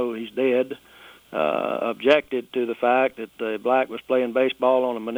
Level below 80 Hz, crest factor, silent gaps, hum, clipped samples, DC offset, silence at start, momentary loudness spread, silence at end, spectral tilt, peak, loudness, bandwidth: -68 dBFS; 18 dB; none; none; under 0.1%; under 0.1%; 0 s; 9 LU; 0 s; -5.5 dB/octave; -4 dBFS; -23 LUFS; over 20 kHz